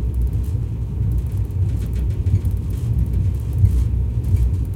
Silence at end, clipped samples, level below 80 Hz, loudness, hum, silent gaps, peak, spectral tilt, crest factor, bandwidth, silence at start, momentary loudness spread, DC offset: 0 s; under 0.1%; -22 dBFS; -21 LUFS; none; none; -4 dBFS; -9 dB/octave; 16 dB; 14 kHz; 0 s; 5 LU; under 0.1%